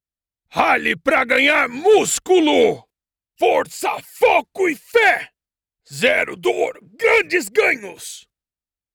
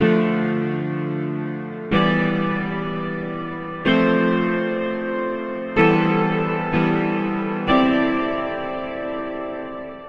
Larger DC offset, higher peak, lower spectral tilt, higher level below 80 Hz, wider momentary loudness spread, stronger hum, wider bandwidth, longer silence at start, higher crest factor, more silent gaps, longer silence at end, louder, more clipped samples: neither; about the same, -2 dBFS vs -4 dBFS; second, -2.5 dB/octave vs -8.5 dB/octave; second, -58 dBFS vs -48 dBFS; about the same, 10 LU vs 11 LU; neither; first, 19.5 kHz vs 6.6 kHz; first, 0.55 s vs 0 s; about the same, 16 dB vs 18 dB; neither; first, 0.75 s vs 0 s; first, -17 LUFS vs -21 LUFS; neither